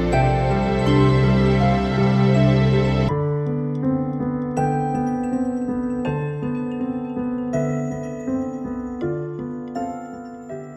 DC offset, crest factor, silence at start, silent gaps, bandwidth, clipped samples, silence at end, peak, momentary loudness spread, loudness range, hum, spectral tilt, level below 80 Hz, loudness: under 0.1%; 16 dB; 0 s; none; 8.4 kHz; under 0.1%; 0 s; -6 dBFS; 12 LU; 8 LU; none; -8 dB/octave; -36 dBFS; -21 LUFS